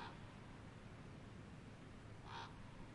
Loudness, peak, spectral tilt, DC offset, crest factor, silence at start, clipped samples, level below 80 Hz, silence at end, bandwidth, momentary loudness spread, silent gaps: -56 LUFS; -40 dBFS; -5.5 dB/octave; under 0.1%; 16 dB; 0 s; under 0.1%; -64 dBFS; 0 s; 11 kHz; 5 LU; none